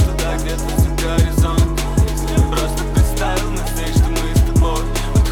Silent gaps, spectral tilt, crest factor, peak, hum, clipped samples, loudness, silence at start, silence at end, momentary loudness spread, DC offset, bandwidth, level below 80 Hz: none; -5.5 dB/octave; 12 dB; -2 dBFS; none; under 0.1%; -18 LUFS; 0 s; 0 s; 5 LU; 0.3%; 18 kHz; -18 dBFS